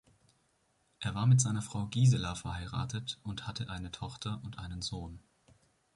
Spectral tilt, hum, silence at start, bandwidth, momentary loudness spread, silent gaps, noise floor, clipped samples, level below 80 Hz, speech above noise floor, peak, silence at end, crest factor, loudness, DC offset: -5 dB/octave; none; 1 s; 11.5 kHz; 14 LU; none; -74 dBFS; under 0.1%; -54 dBFS; 41 dB; -14 dBFS; 0.75 s; 20 dB; -34 LUFS; under 0.1%